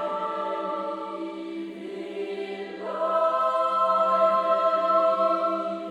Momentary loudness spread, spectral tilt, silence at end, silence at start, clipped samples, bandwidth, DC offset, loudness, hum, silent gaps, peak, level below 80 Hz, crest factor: 13 LU; -5.5 dB/octave; 0 s; 0 s; under 0.1%; 9.8 kHz; under 0.1%; -25 LUFS; none; none; -10 dBFS; -76 dBFS; 14 dB